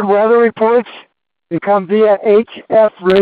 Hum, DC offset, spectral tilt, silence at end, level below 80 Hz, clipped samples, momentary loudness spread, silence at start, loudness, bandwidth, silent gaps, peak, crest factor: none; under 0.1%; -8.5 dB/octave; 0 s; -54 dBFS; under 0.1%; 8 LU; 0 s; -12 LUFS; 4.9 kHz; none; 0 dBFS; 12 dB